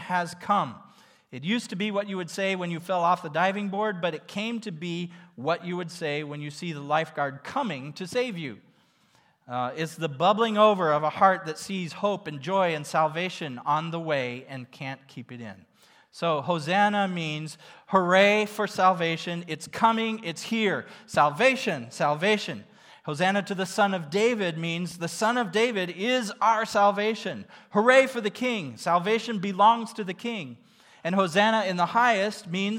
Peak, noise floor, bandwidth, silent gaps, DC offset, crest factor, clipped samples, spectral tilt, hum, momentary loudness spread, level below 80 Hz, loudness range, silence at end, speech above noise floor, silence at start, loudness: -6 dBFS; -63 dBFS; 16.5 kHz; none; under 0.1%; 20 dB; under 0.1%; -5 dB/octave; none; 14 LU; -78 dBFS; 7 LU; 0 s; 37 dB; 0 s; -26 LUFS